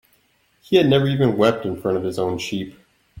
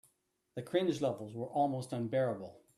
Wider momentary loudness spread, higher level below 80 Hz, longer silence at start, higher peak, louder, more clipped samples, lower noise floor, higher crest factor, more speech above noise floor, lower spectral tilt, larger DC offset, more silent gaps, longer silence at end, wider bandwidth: about the same, 11 LU vs 11 LU; first, -56 dBFS vs -76 dBFS; first, 0.7 s vs 0.55 s; first, -4 dBFS vs -18 dBFS; first, -20 LUFS vs -35 LUFS; neither; second, -62 dBFS vs -78 dBFS; about the same, 18 dB vs 18 dB; about the same, 43 dB vs 43 dB; about the same, -6.5 dB/octave vs -6.5 dB/octave; neither; neither; second, 0 s vs 0.2 s; first, 16.5 kHz vs 13.5 kHz